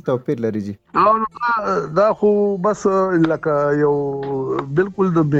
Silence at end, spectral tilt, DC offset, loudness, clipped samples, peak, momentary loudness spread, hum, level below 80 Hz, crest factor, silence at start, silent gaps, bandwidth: 0 s; -8 dB/octave; under 0.1%; -18 LUFS; under 0.1%; -4 dBFS; 7 LU; none; -54 dBFS; 14 dB; 0.05 s; none; 8 kHz